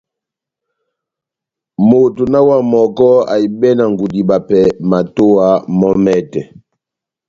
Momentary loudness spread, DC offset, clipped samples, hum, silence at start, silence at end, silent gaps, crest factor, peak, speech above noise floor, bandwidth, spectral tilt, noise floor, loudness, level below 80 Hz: 6 LU; under 0.1%; under 0.1%; none; 1.8 s; 0.85 s; none; 12 dB; 0 dBFS; 73 dB; 7.4 kHz; -8.5 dB/octave; -84 dBFS; -11 LUFS; -48 dBFS